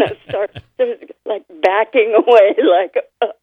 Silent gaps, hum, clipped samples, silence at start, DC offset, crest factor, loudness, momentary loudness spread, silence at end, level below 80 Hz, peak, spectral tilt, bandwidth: none; none; under 0.1%; 0 s; under 0.1%; 14 dB; -15 LUFS; 15 LU; 0.1 s; -58 dBFS; 0 dBFS; -6 dB/octave; 6.4 kHz